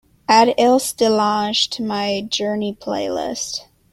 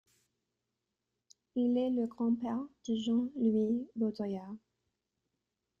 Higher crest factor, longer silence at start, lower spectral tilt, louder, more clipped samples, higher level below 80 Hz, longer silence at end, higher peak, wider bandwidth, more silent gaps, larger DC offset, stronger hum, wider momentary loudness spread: about the same, 18 dB vs 16 dB; second, 0.3 s vs 1.55 s; second, -3 dB/octave vs -7.5 dB/octave; first, -18 LUFS vs -34 LUFS; neither; first, -56 dBFS vs -74 dBFS; second, 0.3 s vs 1.25 s; first, 0 dBFS vs -20 dBFS; first, 16 kHz vs 7.4 kHz; neither; neither; neither; about the same, 10 LU vs 10 LU